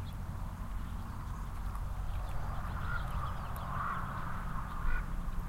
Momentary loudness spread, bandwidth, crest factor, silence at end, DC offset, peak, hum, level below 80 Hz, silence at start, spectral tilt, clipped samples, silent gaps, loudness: 5 LU; 16 kHz; 16 dB; 0 s; under 0.1%; -22 dBFS; none; -38 dBFS; 0 s; -6.5 dB/octave; under 0.1%; none; -41 LUFS